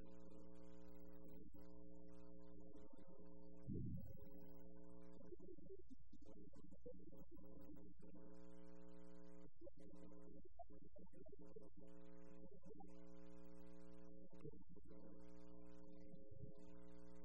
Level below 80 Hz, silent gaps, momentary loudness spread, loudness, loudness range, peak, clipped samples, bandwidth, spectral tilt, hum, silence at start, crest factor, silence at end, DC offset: -70 dBFS; none; 4 LU; -63 LUFS; 6 LU; -38 dBFS; under 0.1%; 16 kHz; -8.5 dB/octave; none; 0 s; 22 dB; 0 s; 0.3%